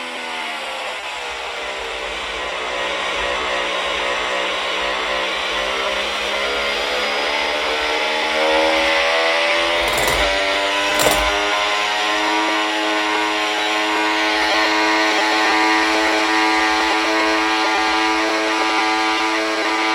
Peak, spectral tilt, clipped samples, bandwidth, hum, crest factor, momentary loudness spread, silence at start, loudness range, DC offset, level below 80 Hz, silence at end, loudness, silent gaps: 0 dBFS; -1.5 dB/octave; under 0.1%; 16 kHz; none; 18 dB; 9 LU; 0 s; 5 LU; under 0.1%; -44 dBFS; 0 s; -17 LUFS; none